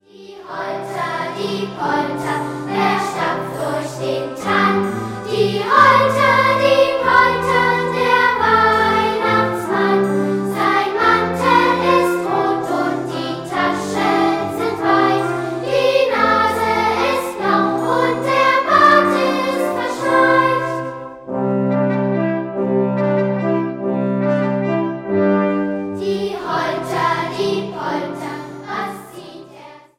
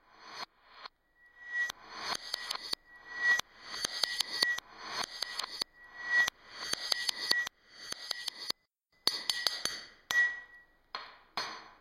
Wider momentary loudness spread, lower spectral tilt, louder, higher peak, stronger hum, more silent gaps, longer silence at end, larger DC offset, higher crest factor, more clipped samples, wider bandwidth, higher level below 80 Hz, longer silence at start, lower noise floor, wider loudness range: second, 10 LU vs 17 LU; first, -5.5 dB/octave vs 1 dB/octave; first, -17 LUFS vs -33 LUFS; first, 0 dBFS vs -8 dBFS; neither; neither; first, 0.2 s vs 0.05 s; neither; second, 16 dB vs 30 dB; neither; about the same, 16.5 kHz vs 16 kHz; first, -52 dBFS vs -70 dBFS; about the same, 0.2 s vs 0.15 s; second, -40 dBFS vs -74 dBFS; first, 7 LU vs 2 LU